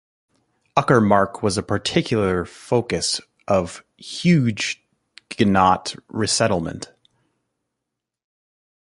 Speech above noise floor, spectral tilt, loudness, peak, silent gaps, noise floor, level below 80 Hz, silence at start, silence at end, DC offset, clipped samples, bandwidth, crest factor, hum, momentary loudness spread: 63 dB; -5 dB/octave; -20 LUFS; -2 dBFS; none; -82 dBFS; -48 dBFS; 0.75 s; 2 s; under 0.1%; under 0.1%; 11.5 kHz; 20 dB; none; 16 LU